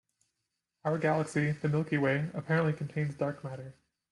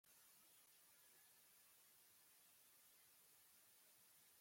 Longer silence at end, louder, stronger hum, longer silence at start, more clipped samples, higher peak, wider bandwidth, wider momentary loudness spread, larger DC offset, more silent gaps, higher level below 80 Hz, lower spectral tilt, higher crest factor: first, 0.4 s vs 0 s; first, -31 LUFS vs -69 LUFS; neither; first, 0.85 s vs 0.05 s; neither; first, -16 dBFS vs -58 dBFS; second, 11 kHz vs 16.5 kHz; first, 12 LU vs 1 LU; neither; neither; first, -68 dBFS vs under -90 dBFS; first, -7.5 dB/octave vs 0 dB/octave; about the same, 16 dB vs 14 dB